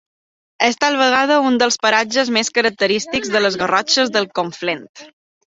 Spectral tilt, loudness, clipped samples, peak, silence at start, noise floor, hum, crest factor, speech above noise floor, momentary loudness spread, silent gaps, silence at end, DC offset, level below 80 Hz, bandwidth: -2 dB/octave; -16 LUFS; under 0.1%; 0 dBFS; 0.6 s; under -90 dBFS; none; 16 dB; over 73 dB; 8 LU; 4.89-4.94 s; 0.45 s; under 0.1%; -60 dBFS; 8 kHz